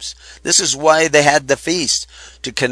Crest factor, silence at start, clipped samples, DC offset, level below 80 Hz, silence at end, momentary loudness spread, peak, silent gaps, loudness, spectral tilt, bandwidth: 16 dB; 0 s; under 0.1%; under 0.1%; -48 dBFS; 0 s; 17 LU; 0 dBFS; none; -14 LUFS; -2 dB/octave; 11 kHz